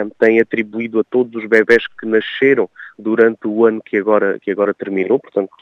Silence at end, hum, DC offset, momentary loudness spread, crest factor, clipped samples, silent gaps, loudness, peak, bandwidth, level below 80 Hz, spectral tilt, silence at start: 0.15 s; none; under 0.1%; 7 LU; 16 dB; under 0.1%; none; -16 LUFS; 0 dBFS; 6.8 kHz; -66 dBFS; -7 dB/octave; 0 s